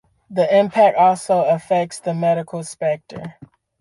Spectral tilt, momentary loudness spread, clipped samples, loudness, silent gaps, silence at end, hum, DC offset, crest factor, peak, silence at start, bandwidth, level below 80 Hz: -5.5 dB/octave; 16 LU; under 0.1%; -18 LUFS; none; 0.35 s; none; under 0.1%; 16 dB; -2 dBFS; 0.3 s; 11.5 kHz; -64 dBFS